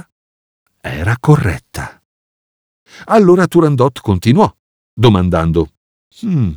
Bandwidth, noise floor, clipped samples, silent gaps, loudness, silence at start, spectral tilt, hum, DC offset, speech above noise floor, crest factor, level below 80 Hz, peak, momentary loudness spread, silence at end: 19.5 kHz; under -90 dBFS; under 0.1%; 2.05-2.86 s, 4.59-4.97 s, 5.77-6.11 s; -13 LUFS; 0.85 s; -7.5 dB/octave; none; under 0.1%; over 78 dB; 14 dB; -36 dBFS; 0 dBFS; 17 LU; 0 s